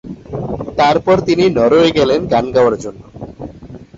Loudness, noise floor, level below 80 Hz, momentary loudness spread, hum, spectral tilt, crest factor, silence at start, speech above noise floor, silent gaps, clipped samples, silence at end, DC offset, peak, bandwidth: -13 LUFS; -34 dBFS; -40 dBFS; 20 LU; none; -6 dB/octave; 12 dB; 0.05 s; 22 dB; none; under 0.1%; 0.15 s; under 0.1%; -2 dBFS; 7.8 kHz